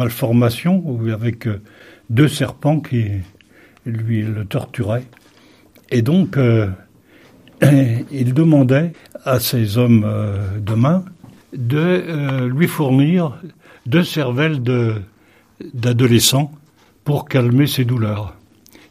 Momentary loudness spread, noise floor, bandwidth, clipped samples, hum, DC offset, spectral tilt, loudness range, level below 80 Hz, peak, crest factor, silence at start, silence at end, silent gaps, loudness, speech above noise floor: 13 LU; -49 dBFS; 15.5 kHz; under 0.1%; none; under 0.1%; -6 dB/octave; 5 LU; -52 dBFS; 0 dBFS; 16 dB; 0 s; 0.6 s; none; -17 LUFS; 33 dB